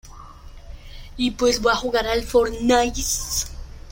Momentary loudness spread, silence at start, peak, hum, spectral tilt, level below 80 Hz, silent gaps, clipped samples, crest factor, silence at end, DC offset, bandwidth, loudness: 15 LU; 0.05 s; -6 dBFS; none; -3 dB/octave; -36 dBFS; none; under 0.1%; 18 dB; 0 s; under 0.1%; 16.5 kHz; -21 LUFS